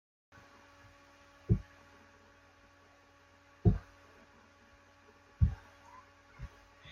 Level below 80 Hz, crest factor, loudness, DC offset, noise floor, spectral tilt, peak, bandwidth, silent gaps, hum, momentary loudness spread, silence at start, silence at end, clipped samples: -46 dBFS; 26 dB; -34 LUFS; under 0.1%; -63 dBFS; -9 dB/octave; -14 dBFS; 7 kHz; none; none; 28 LU; 1.5 s; 0 s; under 0.1%